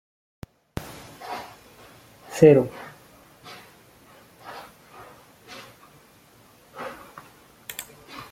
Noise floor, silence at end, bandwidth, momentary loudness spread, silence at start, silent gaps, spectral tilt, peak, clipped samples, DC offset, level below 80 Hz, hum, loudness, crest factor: -54 dBFS; 0.1 s; 16.5 kHz; 30 LU; 0.75 s; none; -6.5 dB/octave; -2 dBFS; under 0.1%; under 0.1%; -58 dBFS; none; -23 LUFS; 26 dB